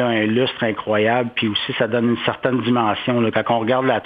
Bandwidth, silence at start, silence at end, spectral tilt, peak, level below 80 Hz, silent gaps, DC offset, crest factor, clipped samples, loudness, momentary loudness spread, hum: 5 kHz; 0 s; 0 s; -8.5 dB/octave; -2 dBFS; -60 dBFS; none; under 0.1%; 18 dB; under 0.1%; -19 LUFS; 3 LU; none